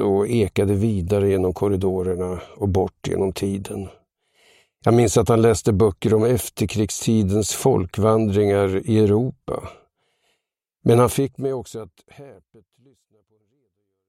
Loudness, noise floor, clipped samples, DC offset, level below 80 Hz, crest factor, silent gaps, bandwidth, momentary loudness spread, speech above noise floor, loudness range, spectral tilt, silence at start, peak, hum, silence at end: -20 LUFS; -77 dBFS; under 0.1%; under 0.1%; -46 dBFS; 18 dB; none; 16 kHz; 12 LU; 58 dB; 6 LU; -6.5 dB/octave; 0 s; -2 dBFS; none; 1.75 s